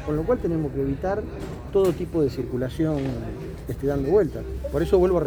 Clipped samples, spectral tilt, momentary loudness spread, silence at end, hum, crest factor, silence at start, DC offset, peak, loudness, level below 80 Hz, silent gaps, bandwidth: under 0.1%; -8 dB/octave; 11 LU; 0 s; none; 16 dB; 0 s; under 0.1%; -8 dBFS; -25 LUFS; -36 dBFS; none; over 20 kHz